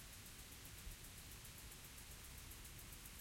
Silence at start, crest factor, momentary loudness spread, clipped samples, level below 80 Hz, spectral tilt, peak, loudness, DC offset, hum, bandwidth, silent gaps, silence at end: 0 s; 18 dB; 1 LU; under 0.1%; -62 dBFS; -2.5 dB/octave; -40 dBFS; -55 LUFS; under 0.1%; none; 16.5 kHz; none; 0 s